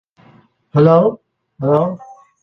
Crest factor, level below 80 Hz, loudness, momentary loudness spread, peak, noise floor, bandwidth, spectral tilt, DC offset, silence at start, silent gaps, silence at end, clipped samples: 14 dB; -54 dBFS; -15 LUFS; 18 LU; -2 dBFS; -50 dBFS; 6 kHz; -10.5 dB/octave; under 0.1%; 0.75 s; none; 0.4 s; under 0.1%